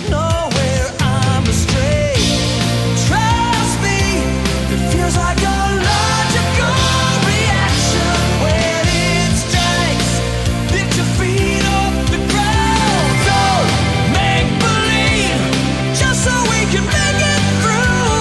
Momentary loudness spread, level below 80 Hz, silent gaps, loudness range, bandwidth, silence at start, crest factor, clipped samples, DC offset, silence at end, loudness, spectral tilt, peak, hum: 3 LU; -24 dBFS; none; 1 LU; 12 kHz; 0 s; 14 dB; under 0.1%; under 0.1%; 0 s; -14 LUFS; -4 dB/octave; 0 dBFS; none